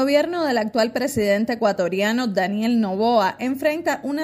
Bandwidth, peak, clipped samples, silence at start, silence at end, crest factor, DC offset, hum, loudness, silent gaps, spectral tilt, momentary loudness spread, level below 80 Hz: 16 kHz; -6 dBFS; under 0.1%; 0 s; 0 s; 16 dB; under 0.1%; none; -21 LUFS; none; -5 dB/octave; 3 LU; -58 dBFS